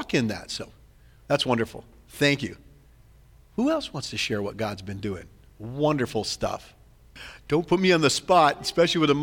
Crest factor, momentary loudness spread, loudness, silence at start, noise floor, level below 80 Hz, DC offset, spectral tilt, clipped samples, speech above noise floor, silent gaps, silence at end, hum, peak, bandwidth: 20 dB; 19 LU; -25 LUFS; 0 s; -54 dBFS; -52 dBFS; under 0.1%; -4.5 dB/octave; under 0.1%; 29 dB; none; 0 s; none; -6 dBFS; 19 kHz